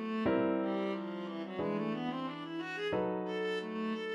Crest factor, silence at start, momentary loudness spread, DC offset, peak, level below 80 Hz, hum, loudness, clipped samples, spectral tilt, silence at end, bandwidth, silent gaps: 16 dB; 0 s; 8 LU; under 0.1%; -20 dBFS; -68 dBFS; none; -36 LUFS; under 0.1%; -7 dB/octave; 0 s; 10.5 kHz; none